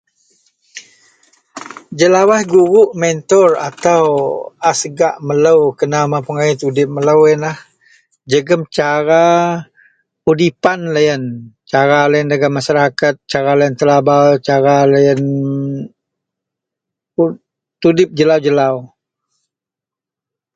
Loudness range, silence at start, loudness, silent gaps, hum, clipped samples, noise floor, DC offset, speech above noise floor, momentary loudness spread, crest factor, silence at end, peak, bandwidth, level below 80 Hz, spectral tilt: 4 LU; 0.75 s; -13 LUFS; none; none; under 0.1%; -86 dBFS; under 0.1%; 75 dB; 10 LU; 14 dB; 1.7 s; 0 dBFS; 9.2 kHz; -56 dBFS; -5.5 dB/octave